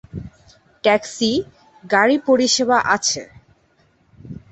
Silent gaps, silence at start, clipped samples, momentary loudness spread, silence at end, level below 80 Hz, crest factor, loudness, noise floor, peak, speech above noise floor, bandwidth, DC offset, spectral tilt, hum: none; 0.15 s; under 0.1%; 20 LU; 0.15 s; -52 dBFS; 18 dB; -18 LUFS; -59 dBFS; -2 dBFS; 42 dB; 8.4 kHz; under 0.1%; -2.5 dB/octave; none